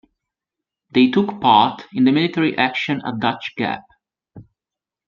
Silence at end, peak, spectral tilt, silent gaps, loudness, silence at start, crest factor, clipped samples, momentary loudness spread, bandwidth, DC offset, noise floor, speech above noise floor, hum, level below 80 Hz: 0.65 s; -2 dBFS; -7 dB/octave; none; -18 LUFS; 0.95 s; 18 dB; under 0.1%; 10 LU; 7 kHz; under 0.1%; -88 dBFS; 70 dB; none; -62 dBFS